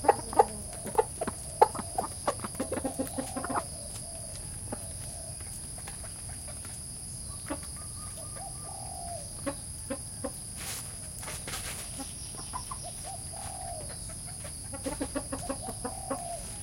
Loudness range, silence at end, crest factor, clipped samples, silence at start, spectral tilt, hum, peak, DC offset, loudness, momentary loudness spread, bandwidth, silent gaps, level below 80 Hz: 7 LU; 0 s; 30 dB; under 0.1%; 0 s; -3.5 dB/octave; none; -6 dBFS; under 0.1%; -35 LUFS; 8 LU; 16.5 kHz; none; -50 dBFS